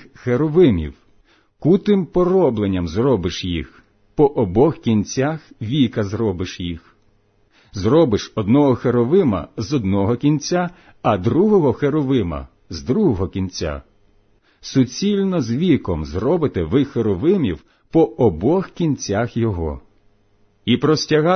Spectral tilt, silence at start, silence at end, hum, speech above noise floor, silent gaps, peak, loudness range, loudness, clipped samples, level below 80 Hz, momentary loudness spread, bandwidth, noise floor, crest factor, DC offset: -7 dB/octave; 0.25 s; 0 s; none; 40 dB; none; -4 dBFS; 3 LU; -19 LUFS; under 0.1%; -40 dBFS; 12 LU; 6.6 kHz; -58 dBFS; 16 dB; under 0.1%